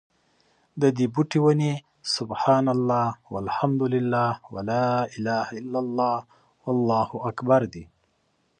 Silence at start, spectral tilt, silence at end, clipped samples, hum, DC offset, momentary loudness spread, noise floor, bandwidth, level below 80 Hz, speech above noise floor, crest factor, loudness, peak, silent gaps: 0.75 s; -6.5 dB/octave; 0.75 s; under 0.1%; none; under 0.1%; 10 LU; -69 dBFS; 10 kHz; -60 dBFS; 46 dB; 18 dB; -24 LUFS; -6 dBFS; none